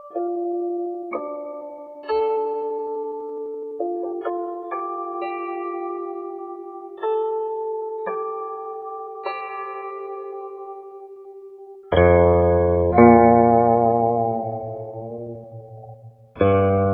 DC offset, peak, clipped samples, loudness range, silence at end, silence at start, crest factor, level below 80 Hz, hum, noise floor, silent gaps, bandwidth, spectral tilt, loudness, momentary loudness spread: under 0.1%; 0 dBFS; under 0.1%; 13 LU; 0 s; 0 s; 20 dB; -44 dBFS; none; -43 dBFS; none; 4.7 kHz; -11 dB/octave; -21 LUFS; 21 LU